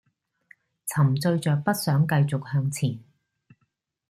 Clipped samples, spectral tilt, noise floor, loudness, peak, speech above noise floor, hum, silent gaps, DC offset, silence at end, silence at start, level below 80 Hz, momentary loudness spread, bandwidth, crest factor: under 0.1%; -6 dB/octave; -74 dBFS; -24 LUFS; -8 dBFS; 51 dB; none; none; under 0.1%; 1.1 s; 0.85 s; -64 dBFS; 8 LU; 15 kHz; 18 dB